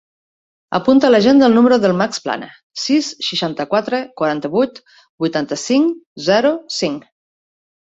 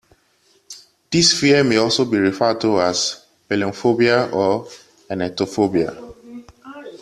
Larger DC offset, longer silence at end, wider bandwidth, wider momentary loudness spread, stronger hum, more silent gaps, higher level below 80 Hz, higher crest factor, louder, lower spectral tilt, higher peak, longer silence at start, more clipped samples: neither; first, 0.9 s vs 0.05 s; second, 8 kHz vs 13 kHz; second, 12 LU vs 24 LU; neither; first, 2.63-2.70 s, 5.09-5.18 s, 6.06-6.16 s vs none; about the same, -58 dBFS vs -56 dBFS; about the same, 16 dB vs 18 dB; about the same, -16 LUFS vs -18 LUFS; about the same, -4.5 dB/octave vs -4 dB/octave; about the same, -2 dBFS vs -2 dBFS; about the same, 0.7 s vs 0.7 s; neither